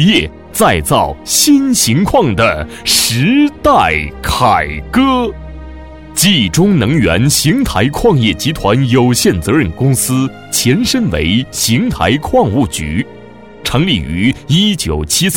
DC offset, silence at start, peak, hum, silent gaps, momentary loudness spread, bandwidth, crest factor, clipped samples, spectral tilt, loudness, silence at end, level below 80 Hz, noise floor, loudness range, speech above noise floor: 0.4%; 0 s; 0 dBFS; none; none; 7 LU; 17.5 kHz; 12 dB; under 0.1%; -4 dB/octave; -12 LUFS; 0 s; -30 dBFS; -31 dBFS; 3 LU; 20 dB